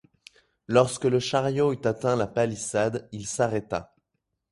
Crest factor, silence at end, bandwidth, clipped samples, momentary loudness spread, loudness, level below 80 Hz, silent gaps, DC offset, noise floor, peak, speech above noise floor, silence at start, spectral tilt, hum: 22 dB; 0.65 s; 11.5 kHz; under 0.1%; 10 LU; -26 LUFS; -58 dBFS; none; under 0.1%; -80 dBFS; -6 dBFS; 55 dB; 0.7 s; -5 dB/octave; none